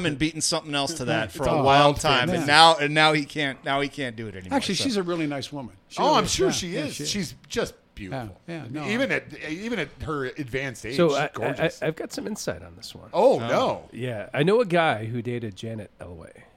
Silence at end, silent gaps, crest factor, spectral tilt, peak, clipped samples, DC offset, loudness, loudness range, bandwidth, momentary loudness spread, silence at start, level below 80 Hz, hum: 0.2 s; none; 24 dB; -4 dB/octave; 0 dBFS; under 0.1%; under 0.1%; -24 LUFS; 10 LU; 16.5 kHz; 16 LU; 0 s; -50 dBFS; none